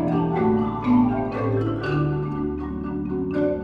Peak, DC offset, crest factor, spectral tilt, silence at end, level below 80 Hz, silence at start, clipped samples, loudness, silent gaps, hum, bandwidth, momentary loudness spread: -8 dBFS; under 0.1%; 14 dB; -10 dB/octave; 0 s; -42 dBFS; 0 s; under 0.1%; -23 LUFS; none; none; 5.6 kHz; 8 LU